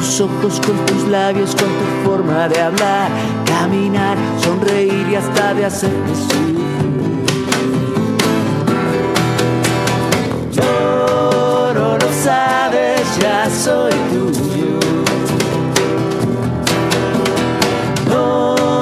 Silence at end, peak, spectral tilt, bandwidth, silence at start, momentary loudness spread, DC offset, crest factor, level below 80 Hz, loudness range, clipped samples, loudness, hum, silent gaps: 0 s; 0 dBFS; -5 dB/octave; 15 kHz; 0 s; 3 LU; under 0.1%; 14 dB; -48 dBFS; 2 LU; under 0.1%; -15 LUFS; none; none